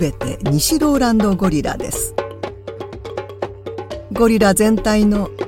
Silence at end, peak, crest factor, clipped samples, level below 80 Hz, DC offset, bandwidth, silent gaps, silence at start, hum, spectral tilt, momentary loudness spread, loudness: 0 s; 0 dBFS; 16 dB; under 0.1%; -34 dBFS; under 0.1%; 17 kHz; none; 0 s; none; -5 dB/octave; 16 LU; -16 LUFS